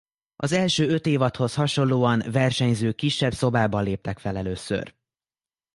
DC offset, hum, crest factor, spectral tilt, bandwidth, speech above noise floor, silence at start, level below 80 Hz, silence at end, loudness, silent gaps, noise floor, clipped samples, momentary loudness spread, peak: under 0.1%; none; 18 dB; -5.5 dB/octave; 11.5 kHz; over 67 dB; 0.4 s; -50 dBFS; 0.85 s; -24 LUFS; none; under -90 dBFS; under 0.1%; 9 LU; -6 dBFS